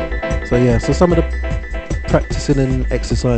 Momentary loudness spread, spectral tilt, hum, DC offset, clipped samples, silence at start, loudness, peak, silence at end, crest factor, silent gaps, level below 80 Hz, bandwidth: 9 LU; -6.5 dB/octave; none; under 0.1%; under 0.1%; 0 s; -17 LUFS; -2 dBFS; 0 s; 14 dB; none; -22 dBFS; 9 kHz